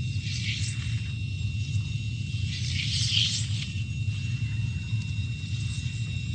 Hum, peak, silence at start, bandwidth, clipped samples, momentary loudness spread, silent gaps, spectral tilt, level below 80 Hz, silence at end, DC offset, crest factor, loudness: none; -10 dBFS; 0 s; 9.4 kHz; under 0.1%; 8 LU; none; -3.5 dB/octave; -42 dBFS; 0 s; under 0.1%; 20 dB; -29 LUFS